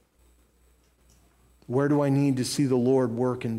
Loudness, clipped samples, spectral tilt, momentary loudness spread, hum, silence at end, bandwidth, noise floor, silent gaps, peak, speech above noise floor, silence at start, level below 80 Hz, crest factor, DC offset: -25 LUFS; under 0.1%; -6.5 dB/octave; 5 LU; none; 0 s; 15.5 kHz; -62 dBFS; none; -12 dBFS; 39 dB; 1.7 s; -62 dBFS; 14 dB; under 0.1%